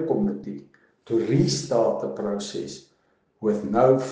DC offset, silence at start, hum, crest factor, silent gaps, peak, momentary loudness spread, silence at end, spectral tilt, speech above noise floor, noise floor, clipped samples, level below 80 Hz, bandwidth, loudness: under 0.1%; 0 s; none; 20 dB; none; -4 dBFS; 17 LU; 0 s; -6 dB/octave; 43 dB; -66 dBFS; under 0.1%; -58 dBFS; 10 kHz; -24 LUFS